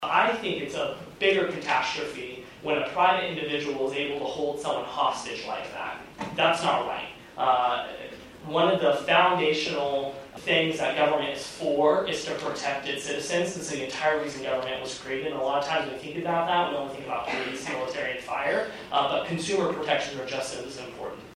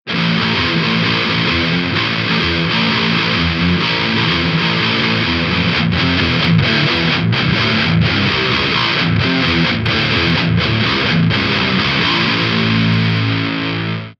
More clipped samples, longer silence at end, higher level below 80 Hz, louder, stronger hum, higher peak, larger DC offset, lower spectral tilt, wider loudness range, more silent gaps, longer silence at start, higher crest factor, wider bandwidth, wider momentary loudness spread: neither; about the same, 0 s vs 0.1 s; second, -62 dBFS vs -36 dBFS; second, -27 LUFS vs -14 LUFS; neither; second, -8 dBFS vs -2 dBFS; neither; second, -3.5 dB/octave vs -6 dB/octave; first, 4 LU vs 1 LU; neither; about the same, 0 s vs 0.05 s; first, 20 dB vs 14 dB; first, 14.5 kHz vs 7.2 kHz; first, 11 LU vs 2 LU